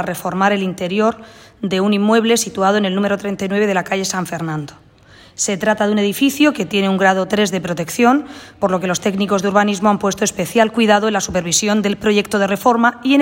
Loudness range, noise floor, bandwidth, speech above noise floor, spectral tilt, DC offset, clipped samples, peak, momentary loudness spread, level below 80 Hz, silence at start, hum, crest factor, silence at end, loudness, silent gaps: 3 LU; -45 dBFS; 16.5 kHz; 29 dB; -4 dB/octave; under 0.1%; under 0.1%; 0 dBFS; 8 LU; -52 dBFS; 0 s; none; 16 dB; 0 s; -16 LUFS; none